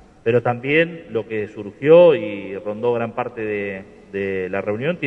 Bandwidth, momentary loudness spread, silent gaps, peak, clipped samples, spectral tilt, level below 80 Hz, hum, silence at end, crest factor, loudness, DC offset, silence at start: 4.2 kHz; 16 LU; none; -2 dBFS; under 0.1%; -8 dB/octave; -58 dBFS; none; 0 s; 18 dB; -19 LUFS; under 0.1%; 0.25 s